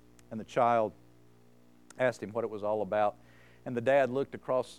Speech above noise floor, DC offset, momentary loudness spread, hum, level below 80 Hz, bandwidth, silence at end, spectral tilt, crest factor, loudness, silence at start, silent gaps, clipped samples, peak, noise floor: 31 dB; under 0.1%; 11 LU; 60 Hz at -65 dBFS; -72 dBFS; 12.5 kHz; 0.05 s; -6 dB/octave; 18 dB; -31 LUFS; 0.3 s; none; under 0.1%; -14 dBFS; -62 dBFS